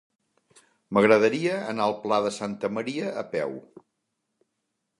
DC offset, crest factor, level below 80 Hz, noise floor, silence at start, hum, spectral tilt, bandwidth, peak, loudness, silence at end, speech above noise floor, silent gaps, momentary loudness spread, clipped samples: under 0.1%; 22 dB; -70 dBFS; -80 dBFS; 0.9 s; none; -5.5 dB/octave; 11.5 kHz; -4 dBFS; -25 LUFS; 1.4 s; 55 dB; none; 11 LU; under 0.1%